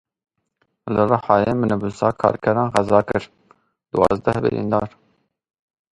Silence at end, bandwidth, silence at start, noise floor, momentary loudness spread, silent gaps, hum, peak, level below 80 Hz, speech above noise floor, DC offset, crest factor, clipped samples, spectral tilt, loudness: 1.05 s; 11.5 kHz; 0.85 s; -69 dBFS; 8 LU; none; none; 0 dBFS; -48 dBFS; 50 dB; under 0.1%; 20 dB; under 0.1%; -7.5 dB/octave; -19 LUFS